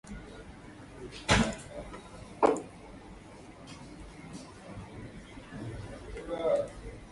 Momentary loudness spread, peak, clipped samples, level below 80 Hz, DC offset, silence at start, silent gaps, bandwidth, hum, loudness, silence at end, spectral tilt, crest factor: 21 LU; -10 dBFS; under 0.1%; -50 dBFS; under 0.1%; 0.05 s; none; 11.5 kHz; none; -32 LUFS; 0 s; -4.5 dB/octave; 26 dB